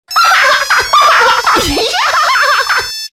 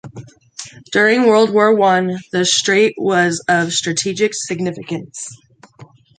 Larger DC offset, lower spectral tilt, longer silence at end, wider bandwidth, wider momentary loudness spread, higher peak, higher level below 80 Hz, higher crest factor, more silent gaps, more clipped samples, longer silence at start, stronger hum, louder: neither; second, -1 dB/octave vs -3.5 dB/octave; second, 0.05 s vs 0.35 s; first, 17 kHz vs 9.4 kHz; second, 5 LU vs 19 LU; about the same, 0 dBFS vs -2 dBFS; first, -36 dBFS vs -62 dBFS; second, 10 dB vs 16 dB; neither; neither; about the same, 0.1 s vs 0.05 s; neither; first, -9 LUFS vs -15 LUFS